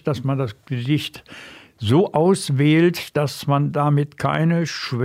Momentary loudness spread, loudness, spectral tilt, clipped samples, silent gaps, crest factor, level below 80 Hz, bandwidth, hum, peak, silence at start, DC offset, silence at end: 12 LU; -20 LUFS; -6.5 dB/octave; under 0.1%; none; 14 dB; -58 dBFS; 15 kHz; none; -6 dBFS; 0.05 s; under 0.1%; 0 s